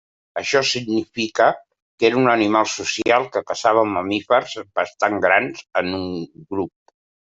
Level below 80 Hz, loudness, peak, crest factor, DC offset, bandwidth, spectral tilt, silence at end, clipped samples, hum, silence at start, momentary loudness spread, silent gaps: -64 dBFS; -20 LUFS; -2 dBFS; 18 dB; under 0.1%; 8 kHz; -4 dB/octave; 0.65 s; under 0.1%; none; 0.35 s; 11 LU; 1.82-1.98 s